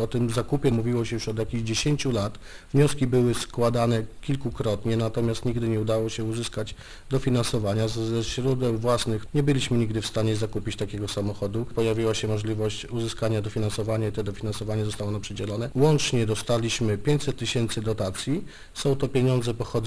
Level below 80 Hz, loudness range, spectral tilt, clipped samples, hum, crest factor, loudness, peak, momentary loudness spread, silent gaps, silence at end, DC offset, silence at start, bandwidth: -42 dBFS; 3 LU; -6 dB/octave; under 0.1%; none; 18 dB; -26 LUFS; -8 dBFS; 8 LU; none; 0 s; under 0.1%; 0 s; 11 kHz